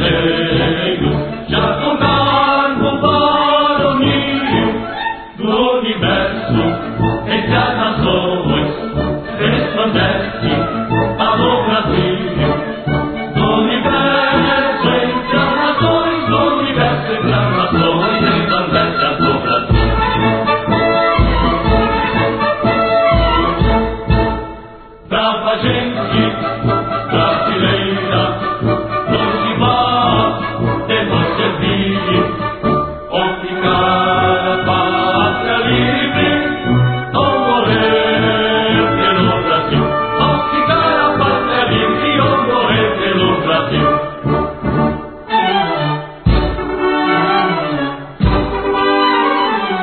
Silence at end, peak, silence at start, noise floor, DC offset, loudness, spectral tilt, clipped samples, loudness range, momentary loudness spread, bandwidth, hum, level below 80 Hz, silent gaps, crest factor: 0 s; 0 dBFS; 0 s; -35 dBFS; under 0.1%; -14 LUFS; -11.5 dB/octave; under 0.1%; 3 LU; 5 LU; 4.6 kHz; none; -28 dBFS; none; 14 dB